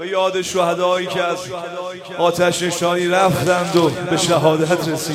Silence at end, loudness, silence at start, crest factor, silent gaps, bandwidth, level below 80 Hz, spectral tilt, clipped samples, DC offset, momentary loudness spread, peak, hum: 0 s; -17 LUFS; 0 s; 16 dB; none; 16.5 kHz; -54 dBFS; -4.5 dB/octave; under 0.1%; under 0.1%; 10 LU; -2 dBFS; none